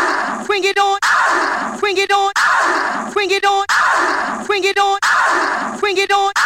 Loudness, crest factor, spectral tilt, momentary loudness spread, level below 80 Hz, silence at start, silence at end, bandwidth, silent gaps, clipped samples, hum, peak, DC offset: -15 LUFS; 12 dB; -1 dB/octave; 5 LU; -56 dBFS; 0 s; 0 s; 16.5 kHz; none; under 0.1%; none; -4 dBFS; under 0.1%